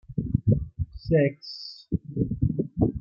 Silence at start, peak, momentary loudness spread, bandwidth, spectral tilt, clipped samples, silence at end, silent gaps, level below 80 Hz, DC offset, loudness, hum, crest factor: 0.1 s; -8 dBFS; 13 LU; 6.8 kHz; -9.5 dB/octave; under 0.1%; 0 s; none; -40 dBFS; under 0.1%; -27 LUFS; none; 20 dB